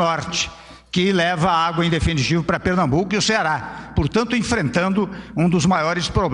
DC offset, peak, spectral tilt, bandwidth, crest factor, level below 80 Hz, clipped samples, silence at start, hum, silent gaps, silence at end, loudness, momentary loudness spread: under 0.1%; -4 dBFS; -5 dB/octave; 11 kHz; 14 dB; -36 dBFS; under 0.1%; 0 s; none; none; 0 s; -19 LUFS; 6 LU